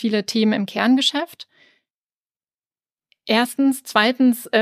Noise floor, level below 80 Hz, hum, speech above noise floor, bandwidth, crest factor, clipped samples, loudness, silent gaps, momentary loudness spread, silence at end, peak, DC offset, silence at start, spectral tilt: under -90 dBFS; -76 dBFS; none; over 71 dB; 15.5 kHz; 20 dB; under 0.1%; -19 LUFS; 1.90-2.40 s, 2.54-2.58 s, 2.66-2.70 s; 7 LU; 0 s; -2 dBFS; under 0.1%; 0 s; -4 dB/octave